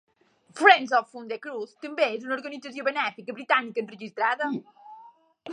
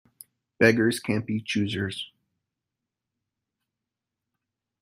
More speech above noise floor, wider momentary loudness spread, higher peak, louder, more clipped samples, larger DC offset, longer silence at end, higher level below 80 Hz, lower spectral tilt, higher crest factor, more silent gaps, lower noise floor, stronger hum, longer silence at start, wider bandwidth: second, 28 dB vs 62 dB; first, 18 LU vs 13 LU; about the same, -2 dBFS vs -4 dBFS; about the same, -25 LUFS vs -25 LUFS; neither; neither; second, 0 s vs 2.75 s; second, -88 dBFS vs -66 dBFS; second, -3.5 dB/octave vs -5.5 dB/octave; about the same, 24 dB vs 24 dB; neither; second, -54 dBFS vs -87 dBFS; neither; about the same, 0.55 s vs 0.6 s; second, 10.5 kHz vs 15.5 kHz